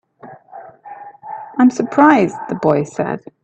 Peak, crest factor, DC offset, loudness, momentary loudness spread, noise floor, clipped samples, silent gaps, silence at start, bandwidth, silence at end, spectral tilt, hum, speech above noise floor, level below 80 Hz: 0 dBFS; 16 dB; under 0.1%; -15 LUFS; 25 LU; -40 dBFS; under 0.1%; none; 0.25 s; 8.4 kHz; 0.25 s; -7 dB/octave; none; 26 dB; -60 dBFS